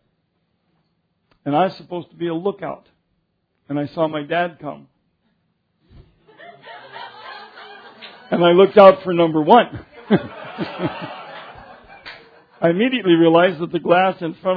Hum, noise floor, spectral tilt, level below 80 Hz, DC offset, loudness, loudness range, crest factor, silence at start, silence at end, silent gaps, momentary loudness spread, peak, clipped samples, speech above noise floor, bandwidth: none; -69 dBFS; -9 dB/octave; -60 dBFS; under 0.1%; -17 LUFS; 13 LU; 20 dB; 1.45 s; 0 s; none; 26 LU; 0 dBFS; under 0.1%; 53 dB; 5.4 kHz